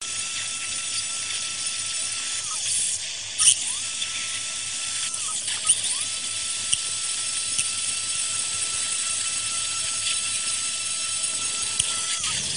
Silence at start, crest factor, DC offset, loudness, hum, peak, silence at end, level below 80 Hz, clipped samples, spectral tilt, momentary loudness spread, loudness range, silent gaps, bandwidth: 0 s; 26 dB; 0.3%; -23 LUFS; none; -2 dBFS; 0 s; -60 dBFS; under 0.1%; 2 dB/octave; 6 LU; 1 LU; none; 10 kHz